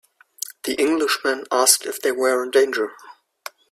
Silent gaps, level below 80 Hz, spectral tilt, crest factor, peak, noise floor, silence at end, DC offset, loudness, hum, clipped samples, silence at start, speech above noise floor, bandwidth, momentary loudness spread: none; -70 dBFS; 0 dB/octave; 22 dB; 0 dBFS; -41 dBFS; 0.6 s; under 0.1%; -20 LUFS; none; under 0.1%; 0.45 s; 21 dB; 15.5 kHz; 17 LU